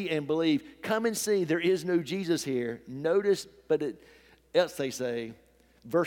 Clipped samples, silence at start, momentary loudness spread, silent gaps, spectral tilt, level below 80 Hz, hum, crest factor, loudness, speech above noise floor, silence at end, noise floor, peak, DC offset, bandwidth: under 0.1%; 0 s; 7 LU; none; -4.5 dB/octave; -68 dBFS; none; 18 dB; -29 LUFS; 20 dB; 0 s; -49 dBFS; -10 dBFS; under 0.1%; 17.5 kHz